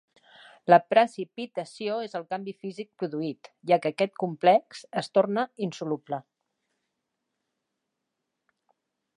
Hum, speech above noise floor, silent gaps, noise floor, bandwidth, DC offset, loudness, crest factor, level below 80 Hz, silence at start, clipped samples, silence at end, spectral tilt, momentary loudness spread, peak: none; 57 dB; none; -83 dBFS; 10.5 kHz; under 0.1%; -27 LUFS; 24 dB; -84 dBFS; 0.65 s; under 0.1%; 2.95 s; -6 dB/octave; 16 LU; -4 dBFS